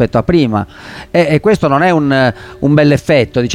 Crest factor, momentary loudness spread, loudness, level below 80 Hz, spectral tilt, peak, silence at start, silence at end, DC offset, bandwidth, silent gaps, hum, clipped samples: 12 dB; 8 LU; -12 LUFS; -36 dBFS; -7 dB/octave; 0 dBFS; 0 s; 0 s; under 0.1%; 13.5 kHz; none; none; under 0.1%